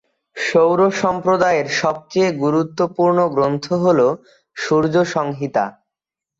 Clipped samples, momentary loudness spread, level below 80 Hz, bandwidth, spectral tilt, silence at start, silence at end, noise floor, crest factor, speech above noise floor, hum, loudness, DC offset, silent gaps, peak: under 0.1%; 8 LU; -58 dBFS; 8 kHz; -6 dB/octave; 0.35 s; 0.7 s; -86 dBFS; 14 dB; 69 dB; none; -17 LUFS; under 0.1%; none; -4 dBFS